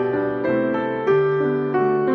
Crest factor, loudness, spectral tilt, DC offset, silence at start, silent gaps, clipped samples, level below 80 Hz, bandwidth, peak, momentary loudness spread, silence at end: 12 dB; -20 LUFS; -9.5 dB/octave; under 0.1%; 0 s; none; under 0.1%; -58 dBFS; 5.4 kHz; -8 dBFS; 4 LU; 0 s